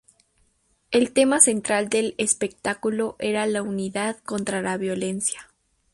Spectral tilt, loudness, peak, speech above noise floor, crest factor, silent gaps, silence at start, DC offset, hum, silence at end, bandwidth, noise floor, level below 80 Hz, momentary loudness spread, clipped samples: -3 dB/octave; -23 LUFS; 0 dBFS; 43 dB; 24 dB; none; 0.9 s; under 0.1%; none; 0.5 s; 11.5 kHz; -66 dBFS; -62 dBFS; 11 LU; under 0.1%